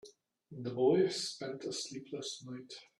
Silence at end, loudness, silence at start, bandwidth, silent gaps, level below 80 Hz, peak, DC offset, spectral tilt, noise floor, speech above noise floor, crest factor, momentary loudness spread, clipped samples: 0.15 s; -35 LUFS; 0.05 s; 12 kHz; none; -80 dBFS; -18 dBFS; under 0.1%; -4.5 dB/octave; -58 dBFS; 23 dB; 20 dB; 17 LU; under 0.1%